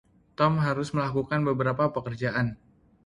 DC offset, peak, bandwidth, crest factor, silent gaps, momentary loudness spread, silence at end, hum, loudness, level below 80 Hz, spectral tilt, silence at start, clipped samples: under 0.1%; -10 dBFS; 11 kHz; 16 dB; none; 6 LU; 0.5 s; none; -27 LUFS; -56 dBFS; -7.5 dB/octave; 0.4 s; under 0.1%